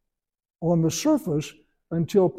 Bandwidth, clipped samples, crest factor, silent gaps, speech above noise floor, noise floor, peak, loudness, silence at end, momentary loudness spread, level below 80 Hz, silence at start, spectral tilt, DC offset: 15.5 kHz; under 0.1%; 16 dB; none; 61 dB; -84 dBFS; -8 dBFS; -24 LUFS; 0 s; 9 LU; -58 dBFS; 0.6 s; -6.5 dB/octave; under 0.1%